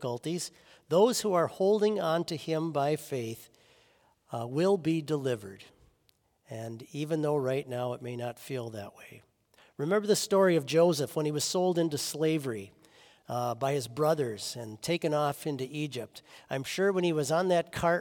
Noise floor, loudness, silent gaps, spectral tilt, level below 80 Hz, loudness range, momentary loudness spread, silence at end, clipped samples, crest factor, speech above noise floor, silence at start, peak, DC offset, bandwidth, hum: -71 dBFS; -30 LUFS; none; -5 dB/octave; -70 dBFS; 7 LU; 15 LU; 0 s; under 0.1%; 20 dB; 41 dB; 0 s; -12 dBFS; under 0.1%; 18 kHz; none